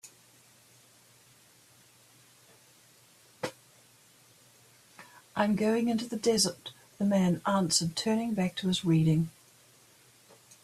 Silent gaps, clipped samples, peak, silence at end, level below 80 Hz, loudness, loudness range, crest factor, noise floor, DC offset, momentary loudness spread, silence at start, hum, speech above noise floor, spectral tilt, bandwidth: none; under 0.1%; -12 dBFS; 1.35 s; -68 dBFS; -29 LUFS; 20 LU; 20 dB; -60 dBFS; under 0.1%; 14 LU; 0.05 s; none; 33 dB; -5 dB/octave; 14 kHz